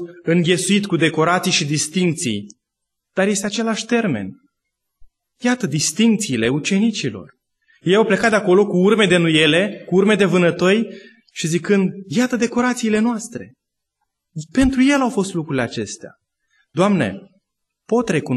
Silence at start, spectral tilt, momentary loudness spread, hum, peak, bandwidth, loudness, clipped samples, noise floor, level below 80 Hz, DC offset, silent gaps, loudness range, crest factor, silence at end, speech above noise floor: 0 s; -4.5 dB/octave; 13 LU; none; -2 dBFS; 12.5 kHz; -18 LUFS; under 0.1%; -79 dBFS; -46 dBFS; under 0.1%; none; 6 LU; 16 dB; 0 s; 61 dB